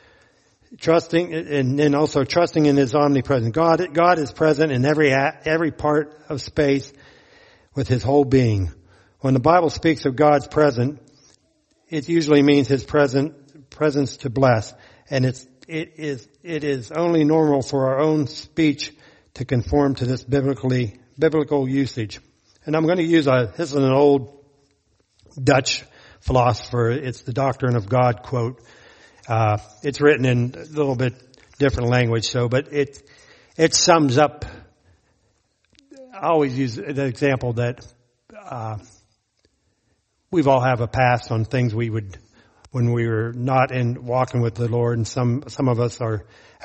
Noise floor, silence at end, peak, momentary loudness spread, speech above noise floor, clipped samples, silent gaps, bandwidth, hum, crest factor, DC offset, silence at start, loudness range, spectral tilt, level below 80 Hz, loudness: -68 dBFS; 0.45 s; 0 dBFS; 12 LU; 48 dB; under 0.1%; none; 8.4 kHz; none; 20 dB; under 0.1%; 0.7 s; 5 LU; -6 dB/octave; -46 dBFS; -20 LUFS